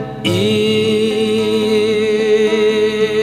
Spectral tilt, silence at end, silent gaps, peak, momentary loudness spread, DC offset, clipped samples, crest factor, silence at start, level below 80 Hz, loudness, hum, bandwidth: -5 dB/octave; 0 s; none; -4 dBFS; 2 LU; under 0.1%; under 0.1%; 10 dB; 0 s; -50 dBFS; -14 LUFS; none; 13.5 kHz